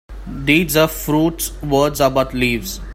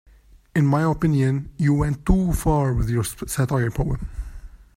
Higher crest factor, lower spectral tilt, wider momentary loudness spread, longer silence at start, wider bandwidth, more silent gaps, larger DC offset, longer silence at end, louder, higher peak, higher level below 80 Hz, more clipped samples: about the same, 16 dB vs 18 dB; second, -4.5 dB/octave vs -7 dB/octave; about the same, 9 LU vs 7 LU; second, 0.1 s vs 0.55 s; about the same, 16.5 kHz vs 16 kHz; neither; neither; second, 0 s vs 0.2 s; first, -17 LUFS vs -22 LUFS; first, 0 dBFS vs -4 dBFS; about the same, -32 dBFS vs -32 dBFS; neither